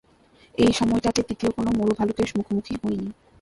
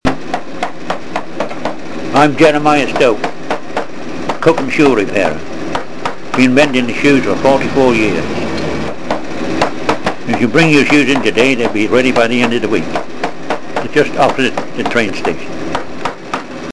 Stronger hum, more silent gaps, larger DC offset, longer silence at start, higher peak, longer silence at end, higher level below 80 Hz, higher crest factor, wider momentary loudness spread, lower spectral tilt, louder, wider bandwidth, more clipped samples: neither; neither; second, under 0.1% vs 9%; first, 0.6 s vs 0 s; second, -4 dBFS vs 0 dBFS; first, 0.3 s vs 0 s; about the same, -46 dBFS vs -42 dBFS; first, 20 dB vs 14 dB; second, 8 LU vs 13 LU; about the same, -5.5 dB/octave vs -5 dB/octave; second, -24 LUFS vs -14 LUFS; about the same, 11.5 kHz vs 11 kHz; neither